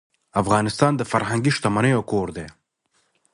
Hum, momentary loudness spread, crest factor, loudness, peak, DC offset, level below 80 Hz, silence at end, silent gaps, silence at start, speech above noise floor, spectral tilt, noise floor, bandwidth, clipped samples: none; 10 LU; 20 dB; -21 LUFS; -2 dBFS; under 0.1%; -50 dBFS; 0.85 s; none; 0.35 s; 48 dB; -5.5 dB/octave; -68 dBFS; 11.5 kHz; under 0.1%